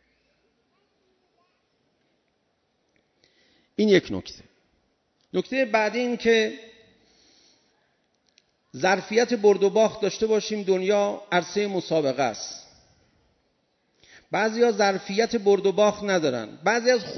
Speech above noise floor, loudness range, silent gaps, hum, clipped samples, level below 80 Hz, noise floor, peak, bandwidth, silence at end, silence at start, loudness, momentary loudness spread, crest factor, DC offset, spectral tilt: 49 dB; 6 LU; none; none; under 0.1%; -64 dBFS; -72 dBFS; -6 dBFS; 6.4 kHz; 0 s; 3.8 s; -23 LUFS; 10 LU; 20 dB; under 0.1%; -4.5 dB/octave